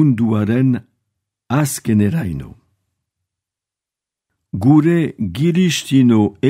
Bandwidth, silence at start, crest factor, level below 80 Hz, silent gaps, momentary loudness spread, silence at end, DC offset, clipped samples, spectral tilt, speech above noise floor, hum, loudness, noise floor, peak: 16 kHz; 0 s; 16 dB; -48 dBFS; none; 10 LU; 0 s; under 0.1%; under 0.1%; -6.5 dB/octave; 72 dB; none; -16 LUFS; -87 dBFS; 0 dBFS